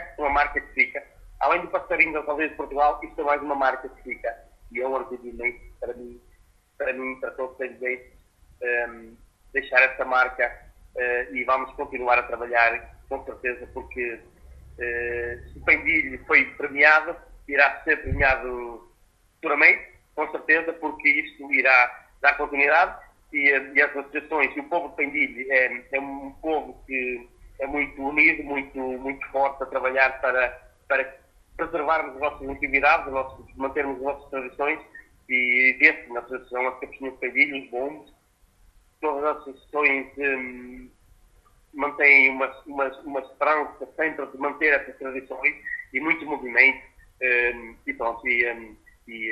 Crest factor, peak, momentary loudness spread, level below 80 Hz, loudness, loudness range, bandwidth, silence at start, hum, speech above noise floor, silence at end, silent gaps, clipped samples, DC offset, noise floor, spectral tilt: 24 dB; -2 dBFS; 16 LU; -48 dBFS; -23 LUFS; 7 LU; 13 kHz; 0 s; none; 37 dB; 0 s; none; under 0.1%; under 0.1%; -61 dBFS; -5.5 dB/octave